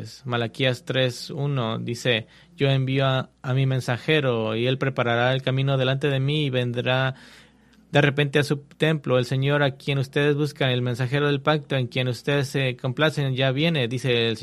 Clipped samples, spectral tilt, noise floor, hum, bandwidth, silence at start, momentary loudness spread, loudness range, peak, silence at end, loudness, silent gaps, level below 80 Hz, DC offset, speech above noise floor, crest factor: under 0.1%; -6 dB/octave; -54 dBFS; none; 13 kHz; 0 s; 5 LU; 1 LU; -4 dBFS; 0 s; -23 LUFS; none; -58 dBFS; under 0.1%; 31 dB; 20 dB